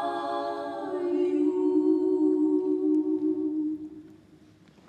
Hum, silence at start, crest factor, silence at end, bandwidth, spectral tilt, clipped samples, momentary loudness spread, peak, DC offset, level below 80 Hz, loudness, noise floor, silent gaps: none; 0 s; 12 dB; 0.75 s; 4.8 kHz; -7 dB/octave; under 0.1%; 9 LU; -14 dBFS; under 0.1%; -72 dBFS; -27 LUFS; -55 dBFS; none